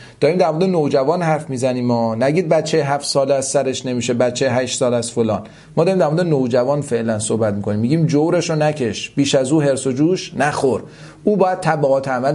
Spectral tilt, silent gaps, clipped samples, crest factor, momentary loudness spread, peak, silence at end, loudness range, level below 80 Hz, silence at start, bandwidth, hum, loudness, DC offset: -5.5 dB/octave; none; under 0.1%; 16 dB; 5 LU; -2 dBFS; 0 s; 1 LU; -54 dBFS; 0 s; 11.5 kHz; none; -17 LUFS; under 0.1%